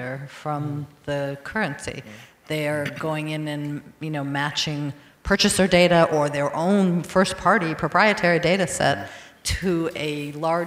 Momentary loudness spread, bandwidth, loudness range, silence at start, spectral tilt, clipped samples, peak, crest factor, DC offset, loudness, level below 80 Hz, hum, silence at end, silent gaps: 15 LU; 16 kHz; 9 LU; 0 s; -4.5 dB/octave; under 0.1%; -4 dBFS; 20 dB; under 0.1%; -22 LUFS; -46 dBFS; none; 0 s; none